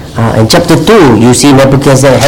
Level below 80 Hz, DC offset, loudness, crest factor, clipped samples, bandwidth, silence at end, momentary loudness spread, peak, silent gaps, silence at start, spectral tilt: -26 dBFS; 2%; -4 LUFS; 4 dB; 8%; 18.5 kHz; 0 s; 3 LU; 0 dBFS; none; 0 s; -5 dB/octave